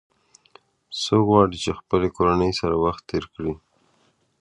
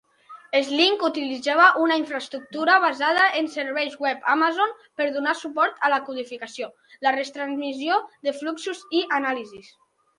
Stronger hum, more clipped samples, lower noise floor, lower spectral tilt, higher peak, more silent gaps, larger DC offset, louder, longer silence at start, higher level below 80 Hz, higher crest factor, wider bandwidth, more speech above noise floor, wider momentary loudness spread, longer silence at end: neither; neither; first, -64 dBFS vs -48 dBFS; first, -6 dB/octave vs -2 dB/octave; about the same, -2 dBFS vs -2 dBFS; neither; neither; about the same, -22 LUFS vs -22 LUFS; first, 0.9 s vs 0.3 s; first, -44 dBFS vs -78 dBFS; about the same, 22 dB vs 20 dB; about the same, 11.5 kHz vs 11 kHz; first, 43 dB vs 25 dB; about the same, 13 LU vs 13 LU; first, 0.85 s vs 0.55 s